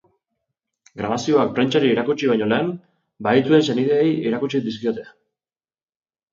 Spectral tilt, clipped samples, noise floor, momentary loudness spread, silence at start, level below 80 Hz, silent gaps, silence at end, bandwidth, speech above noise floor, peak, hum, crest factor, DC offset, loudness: -6 dB/octave; under 0.1%; under -90 dBFS; 10 LU; 0.95 s; -62 dBFS; none; 1.25 s; 7.6 kHz; over 71 dB; -4 dBFS; none; 18 dB; under 0.1%; -20 LUFS